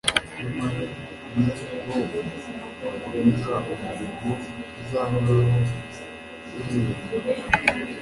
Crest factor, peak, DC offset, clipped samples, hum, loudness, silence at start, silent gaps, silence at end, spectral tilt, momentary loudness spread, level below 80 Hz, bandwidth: 24 dB; -2 dBFS; under 0.1%; under 0.1%; none; -26 LUFS; 0.05 s; none; 0 s; -6 dB/octave; 14 LU; -48 dBFS; 11.5 kHz